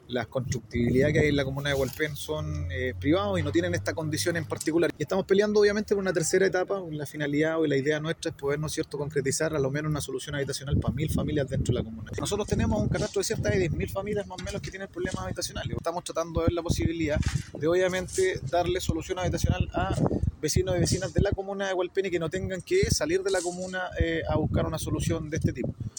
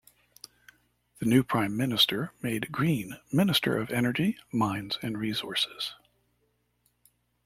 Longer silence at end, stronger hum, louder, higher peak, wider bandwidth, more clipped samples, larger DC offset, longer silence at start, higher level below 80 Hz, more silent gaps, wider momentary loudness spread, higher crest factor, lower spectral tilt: second, 0.1 s vs 1.5 s; second, none vs 60 Hz at -50 dBFS; about the same, -28 LUFS vs -28 LUFS; about the same, -10 dBFS vs -10 dBFS; first, 19 kHz vs 16.5 kHz; neither; neither; second, 0.1 s vs 1.2 s; first, -40 dBFS vs -62 dBFS; neither; about the same, 8 LU vs 9 LU; about the same, 18 dB vs 20 dB; about the same, -5.5 dB/octave vs -5 dB/octave